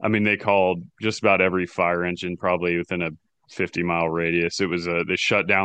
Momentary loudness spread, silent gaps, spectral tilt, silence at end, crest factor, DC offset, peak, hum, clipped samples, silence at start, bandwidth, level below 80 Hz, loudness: 8 LU; none; -5.5 dB/octave; 0 s; 20 dB; under 0.1%; -4 dBFS; none; under 0.1%; 0 s; 9.2 kHz; -56 dBFS; -22 LUFS